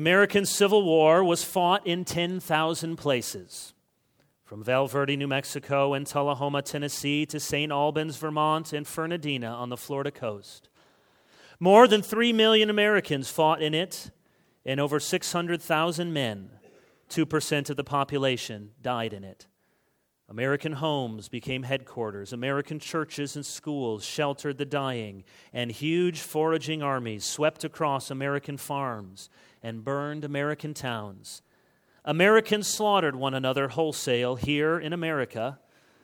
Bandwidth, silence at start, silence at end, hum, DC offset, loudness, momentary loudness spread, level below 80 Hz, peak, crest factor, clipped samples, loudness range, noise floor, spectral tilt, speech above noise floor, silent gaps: 20 kHz; 0 s; 0.5 s; none; under 0.1%; -26 LUFS; 15 LU; -66 dBFS; -4 dBFS; 24 dB; under 0.1%; 9 LU; -72 dBFS; -4.5 dB/octave; 46 dB; none